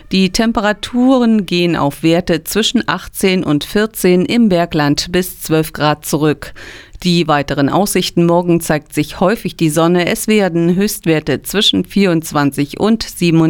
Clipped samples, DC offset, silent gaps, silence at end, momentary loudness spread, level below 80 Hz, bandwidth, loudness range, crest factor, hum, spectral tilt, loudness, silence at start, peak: under 0.1%; under 0.1%; none; 0 s; 5 LU; -38 dBFS; over 20 kHz; 1 LU; 12 dB; none; -5 dB/octave; -14 LUFS; 0.1 s; 0 dBFS